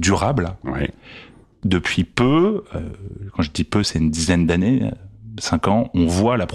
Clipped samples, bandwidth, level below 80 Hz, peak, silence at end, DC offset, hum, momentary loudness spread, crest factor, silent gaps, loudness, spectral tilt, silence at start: under 0.1%; 13 kHz; -40 dBFS; -4 dBFS; 0 s; under 0.1%; none; 14 LU; 16 dB; none; -20 LUFS; -5.5 dB/octave; 0 s